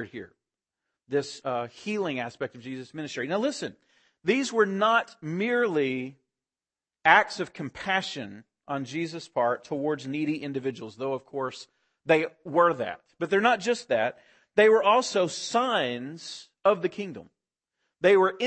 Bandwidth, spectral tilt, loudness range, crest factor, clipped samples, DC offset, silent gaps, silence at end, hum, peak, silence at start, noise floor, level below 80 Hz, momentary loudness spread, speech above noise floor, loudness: 8.8 kHz; -4.5 dB/octave; 7 LU; 24 dB; under 0.1%; under 0.1%; none; 0 s; none; -4 dBFS; 0 s; under -90 dBFS; -72 dBFS; 16 LU; over 64 dB; -26 LUFS